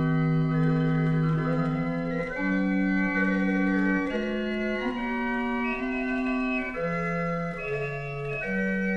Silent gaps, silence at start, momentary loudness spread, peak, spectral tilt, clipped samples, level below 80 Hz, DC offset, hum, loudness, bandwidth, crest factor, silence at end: none; 0 s; 6 LU; -14 dBFS; -8.5 dB/octave; under 0.1%; -46 dBFS; under 0.1%; none; -27 LUFS; 6.8 kHz; 12 dB; 0 s